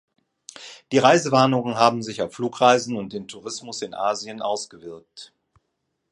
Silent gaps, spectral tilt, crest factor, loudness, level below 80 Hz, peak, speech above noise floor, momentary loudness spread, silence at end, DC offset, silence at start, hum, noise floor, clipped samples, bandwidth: none; -4.5 dB/octave; 22 dB; -21 LUFS; -66 dBFS; 0 dBFS; 54 dB; 23 LU; 0.85 s; under 0.1%; 0.55 s; none; -76 dBFS; under 0.1%; 11.5 kHz